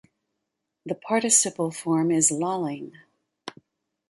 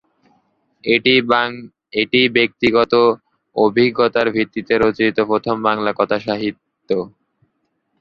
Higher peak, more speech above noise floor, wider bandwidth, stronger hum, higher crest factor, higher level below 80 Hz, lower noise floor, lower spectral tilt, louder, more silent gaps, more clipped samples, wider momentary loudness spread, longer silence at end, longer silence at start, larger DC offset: second, -6 dBFS vs 0 dBFS; first, 57 dB vs 53 dB; first, 11.5 kHz vs 6.6 kHz; neither; about the same, 20 dB vs 16 dB; second, -72 dBFS vs -54 dBFS; first, -82 dBFS vs -69 dBFS; second, -3.5 dB/octave vs -6.5 dB/octave; second, -22 LUFS vs -17 LUFS; neither; neither; first, 23 LU vs 11 LU; second, 0.6 s vs 0.9 s; about the same, 0.85 s vs 0.85 s; neither